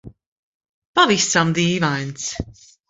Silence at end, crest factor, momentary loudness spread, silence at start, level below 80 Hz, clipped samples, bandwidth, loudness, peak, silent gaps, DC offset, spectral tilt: 0.4 s; 20 dB; 13 LU; 0.05 s; -46 dBFS; under 0.1%; 8 kHz; -18 LUFS; -2 dBFS; 0.26-0.60 s, 0.69-0.94 s; under 0.1%; -3.5 dB/octave